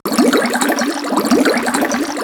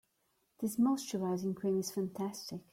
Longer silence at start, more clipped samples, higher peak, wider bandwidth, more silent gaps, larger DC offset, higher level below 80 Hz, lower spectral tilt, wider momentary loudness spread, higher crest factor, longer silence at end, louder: second, 0.05 s vs 0.6 s; neither; first, 0 dBFS vs -22 dBFS; first, 19 kHz vs 16.5 kHz; neither; neither; first, -54 dBFS vs -76 dBFS; second, -3 dB/octave vs -6 dB/octave; second, 4 LU vs 8 LU; about the same, 14 dB vs 14 dB; second, 0 s vs 0.15 s; first, -15 LUFS vs -36 LUFS